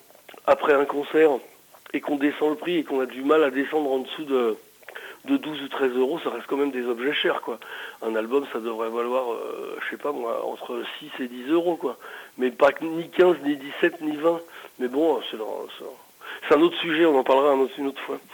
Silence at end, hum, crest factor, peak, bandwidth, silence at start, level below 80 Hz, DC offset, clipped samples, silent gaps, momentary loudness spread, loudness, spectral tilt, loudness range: 0.15 s; none; 18 dB; -6 dBFS; 19.5 kHz; 0.45 s; -72 dBFS; under 0.1%; under 0.1%; none; 14 LU; -24 LUFS; -5 dB/octave; 5 LU